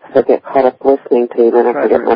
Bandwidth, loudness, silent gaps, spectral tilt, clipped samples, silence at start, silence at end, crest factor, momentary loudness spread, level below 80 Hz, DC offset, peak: 5.2 kHz; -12 LUFS; none; -9 dB/octave; 0.1%; 0.05 s; 0 s; 12 dB; 3 LU; -54 dBFS; under 0.1%; 0 dBFS